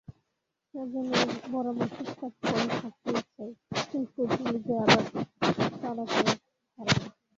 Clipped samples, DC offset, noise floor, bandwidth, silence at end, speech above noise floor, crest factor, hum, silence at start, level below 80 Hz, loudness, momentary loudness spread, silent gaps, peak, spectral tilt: under 0.1%; under 0.1%; -82 dBFS; 7.8 kHz; 0.3 s; 53 dB; 24 dB; none; 0.1 s; -60 dBFS; -29 LUFS; 12 LU; none; -6 dBFS; -4.5 dB/octave